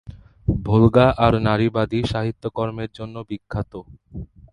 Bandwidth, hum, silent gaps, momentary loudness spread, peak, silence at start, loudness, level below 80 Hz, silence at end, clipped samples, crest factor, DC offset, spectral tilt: 10 kHz; none; none; 22 LU; 0 dBFS; 0.05 s; -20 LUFS; -38 dBFS; 0.25 s; under 0.1%; 20 dB; under 0.1%; -8.5 dB/octave